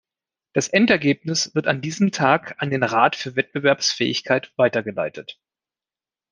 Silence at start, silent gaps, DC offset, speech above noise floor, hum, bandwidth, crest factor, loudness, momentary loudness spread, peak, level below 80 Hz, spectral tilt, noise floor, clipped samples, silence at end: 0.55 s; none; under 0.1%; over 69 dB; none; 10.5 kHz; 20 dB; -20 LUFS; 9 LU; -2 dBFS; -66 dBFS; -4 dB/octave; under -90 dBFS; under 0.1%; 1 s